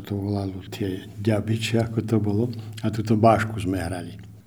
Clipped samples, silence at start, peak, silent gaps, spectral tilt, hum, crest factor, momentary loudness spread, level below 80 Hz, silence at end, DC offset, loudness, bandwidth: under 0.1%; 0 s; -4 dBFS; none; -7 dB/octave; none; 20 dB; 12 LU; -52 dBFS; 0.05 s; under 0.1%; -24 LUFS; 17.5 kHz